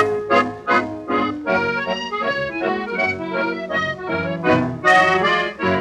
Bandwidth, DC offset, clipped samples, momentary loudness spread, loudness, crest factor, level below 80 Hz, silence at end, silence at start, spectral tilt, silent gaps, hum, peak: 12 kHz; under 0.1%; under 0.1%; 8 LU; -19 LUFS; 16 dB; -54 dBFS; 0 s; 0 s; -5.5 dB/octave; none; none; -2 dBFS